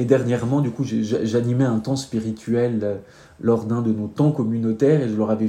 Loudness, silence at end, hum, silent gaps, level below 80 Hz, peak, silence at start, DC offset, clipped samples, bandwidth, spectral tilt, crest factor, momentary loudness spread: -21 LUFS; 0 s; none; none; -58 dBFS; -2 dBFS; 0 s; under 0.1%; under 0.1%; 11.5 kHz; -8 dB/octave; 18 dB; 7 LU